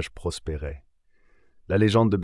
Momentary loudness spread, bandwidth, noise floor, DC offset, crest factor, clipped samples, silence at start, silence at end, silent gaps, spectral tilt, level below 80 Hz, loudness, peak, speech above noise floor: 17 LU; 12 kHz; -59 dBFS; under 0.1%; 18 dB; under 0.1%; 0 s; 0 s; none; -6.5 dB/octave; -44 dBFS; -25 LUFS; -8 dBFS; 36 dB